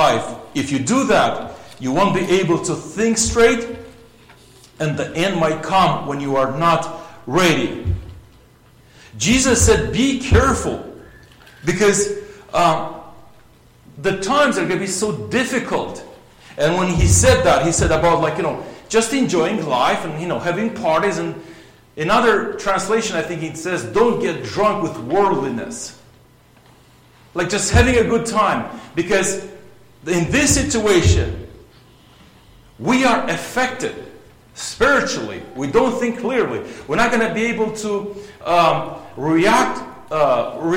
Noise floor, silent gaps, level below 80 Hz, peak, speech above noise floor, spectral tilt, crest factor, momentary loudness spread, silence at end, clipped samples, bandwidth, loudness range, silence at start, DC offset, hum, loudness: -50 dBFS; none; -34 dBFS; 0 dBFS; 32 dB; -4.5 dB/octave; 18 dB; 14 LU; 0 s; under 0.1%; 16.5 kHz; 4 LU; 0 s; under 0.1%; none; -18 LUFS